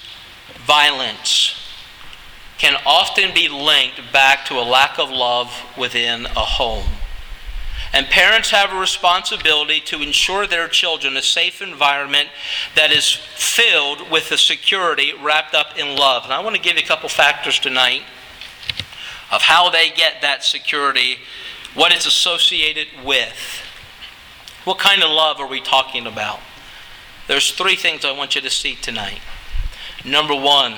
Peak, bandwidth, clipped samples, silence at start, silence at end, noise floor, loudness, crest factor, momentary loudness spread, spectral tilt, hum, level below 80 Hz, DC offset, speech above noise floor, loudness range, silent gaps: 0 dBFS; over 20 kHz; under 0.1%; 0 s; 0 s; -39 dBFS; -15 LUFS; 18 dB; 18 LU; -0.5 dB/octave; none; -36 dBFS; under 0.1%; 23 dB; 4 LU; none